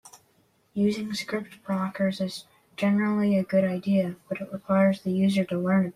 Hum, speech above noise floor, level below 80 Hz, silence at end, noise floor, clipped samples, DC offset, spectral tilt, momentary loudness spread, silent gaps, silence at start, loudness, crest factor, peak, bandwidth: none; 40 dB; -68 dBFS; 0.05 s; -65 dBFS; under 0.1%; under 0.1%; -7 dB/octave; 11 LU; none; 0.05 s; -26 LUFS; 14 dB; -12 dBFS; 13 kHz